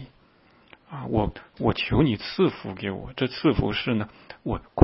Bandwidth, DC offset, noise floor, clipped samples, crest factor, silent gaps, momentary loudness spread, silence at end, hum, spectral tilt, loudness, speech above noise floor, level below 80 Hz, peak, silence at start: 5.8 kHz; under 0.1%; -58 dBFS; under 0.1%; 26 dB; none; 11 LU; 0 s; none; -11 dB/octave; -26 LUFS; 33 dB; -42 dBFS; 0 dBFS; 0 s